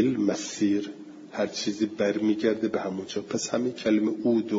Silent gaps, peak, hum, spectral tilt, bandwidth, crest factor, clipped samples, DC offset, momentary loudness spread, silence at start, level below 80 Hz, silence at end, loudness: none; -10 dBFS; none; -5 dB/octave; 7.8 kHz; 16 dB; under 0.1%; under 0.1%; 7 LU; 0 s; -70 dBFS; 0 s; -27 LUFS